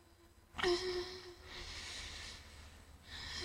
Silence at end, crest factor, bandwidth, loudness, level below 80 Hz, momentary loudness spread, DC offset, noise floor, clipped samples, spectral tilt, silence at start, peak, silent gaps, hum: 0 s; 22 dB; 16 kHz; -42 LUFS; -58 dBFS; 20 LU; under 0.1%; -64 dBFS; under 0.1%; -3.5 dB/octave; 0 s; -22 dBFS; none; none